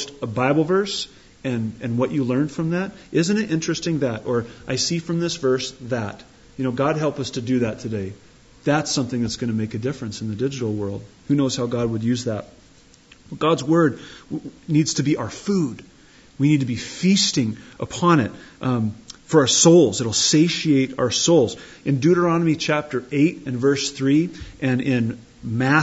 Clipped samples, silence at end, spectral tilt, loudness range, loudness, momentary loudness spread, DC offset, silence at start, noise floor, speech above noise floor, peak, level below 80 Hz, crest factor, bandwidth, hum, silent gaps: under 0.1%; 0 s; -4.5 dB/octave; 7 LU; -21 LUFS; 12 LU; under 0.1%; 0 s; -51 dBFS; 30 dB; -2 dBFS; -54 dBFS; 18 dB; 8 kHz; none; none